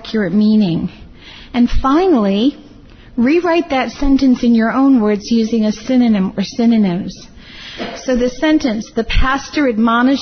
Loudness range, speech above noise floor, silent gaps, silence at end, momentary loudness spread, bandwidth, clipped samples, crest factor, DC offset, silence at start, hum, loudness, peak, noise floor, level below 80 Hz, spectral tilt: 3 LU; 25 dB; none; 0 s; 11 LU; 6.6 kHz; under 0.1%; 12 dB; under 0.1%; 0 s; none; -14 LUFS; -2 dBFS; -39 dBFS; -30 dBFS; -6 dB/octave